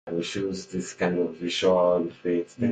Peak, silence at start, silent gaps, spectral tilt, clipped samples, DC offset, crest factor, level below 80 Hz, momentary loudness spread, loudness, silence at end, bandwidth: -10 dBFS; 0.05 s; none; -5 dB/octave; under 0.1%; under 0.1%; 16 dB; -58 dBFS; 9 LU; -26 LUFS; 0 s; 9.4 kHz